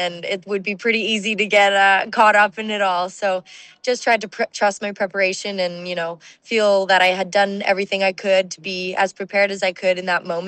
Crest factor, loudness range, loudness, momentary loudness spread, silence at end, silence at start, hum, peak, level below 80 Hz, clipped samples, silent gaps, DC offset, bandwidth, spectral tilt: 16 dB; 4 LU; -19 LUFS; 11 LU; 0 s; 0 s; none; -4 dBFS; -70 dBFS; under 0.1%; none; under 0.1%; 9.4 kHz; -3 dB/octave